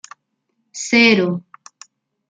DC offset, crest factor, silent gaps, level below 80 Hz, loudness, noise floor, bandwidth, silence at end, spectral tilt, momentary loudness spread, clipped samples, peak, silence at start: under 0.1%; 18 dB; none; -66 dBFS; -14 LUFS; -72 dBFS; 9.4 kHz; 0.9 s; -4 dB/octave; 18 LU; under 0.1%; -2 dBFS; 0.75 s